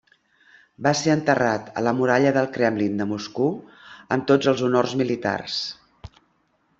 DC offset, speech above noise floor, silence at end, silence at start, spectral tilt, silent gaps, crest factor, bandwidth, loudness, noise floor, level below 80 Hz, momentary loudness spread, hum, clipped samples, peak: under 0.1%; 45 dB; 0.7 s; 0.8 s; -5.5 dB/octave; none; 20 dB; 8 kHz; -22 LUFS; -66 dBFS; -58 dBFS; 8 LU; none; under 0.1%; -4 dBFS